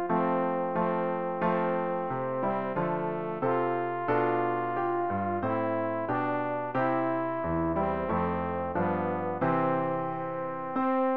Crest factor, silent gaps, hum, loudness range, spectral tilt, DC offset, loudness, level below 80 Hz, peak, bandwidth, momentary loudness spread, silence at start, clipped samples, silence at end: 14 dB; none; none; 1 LU; -7 dB/octave; 0.3%; -29 LUFS; -58 dBFS; -14 dBFS; 5 kHz; 4 LU; 0 s; under 0.1%; 0 s